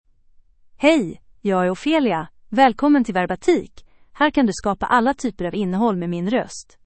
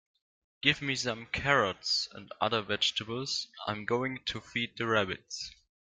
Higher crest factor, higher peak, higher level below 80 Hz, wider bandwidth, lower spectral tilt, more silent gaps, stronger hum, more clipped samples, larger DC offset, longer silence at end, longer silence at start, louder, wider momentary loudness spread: second, 20 dB vs 26 dB; first, 0 dBFS vs -6 dBFS; first, -48 dBFS vs -62 dBFS; second, 8.8 kHz vs 12 kHz; first, -5.5 dB/octave vs -3 dB/octave; neither; neither; neither; neither; second, 0.25 s vs 0.4 s; first, 0.8 s vs 0.65 s; first, -20 LUFS vs -31 LUFS; about the same, 8 LU vs 10 LU